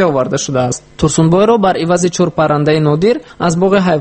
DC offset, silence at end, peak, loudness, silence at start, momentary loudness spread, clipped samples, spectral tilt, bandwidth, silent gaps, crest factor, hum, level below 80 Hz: under 0.1%; 0 s; 0 dBFS; -12 LUFS; 0 s; 6 LU; under 0.1%; -5.5 dB/octave; 8.8 kHz; none; 12 dB; none; -40 dBFS